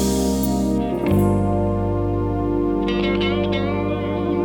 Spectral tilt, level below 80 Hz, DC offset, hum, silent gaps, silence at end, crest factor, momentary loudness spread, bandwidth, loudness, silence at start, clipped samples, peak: -6.5 dB/octave; -32 dBFS; under 0.1%; none; none; 0 s; 12 dB; 4 LU; over 20 kHz; -21 LUFS; 0 s; under 0.1%; -6 dBFS